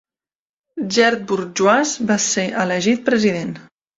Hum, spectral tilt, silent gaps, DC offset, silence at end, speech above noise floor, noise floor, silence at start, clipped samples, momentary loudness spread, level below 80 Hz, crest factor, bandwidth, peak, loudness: none; -3.5 dB/octave; none; under 0.1%; 0.35 s; over 72 dB; under -90 dBFS; 0.75 s; under 0.1%; 13 LU; -60 dBFS; 18 dB; 7.8 kHz; -2 dBFS; -17 LUFS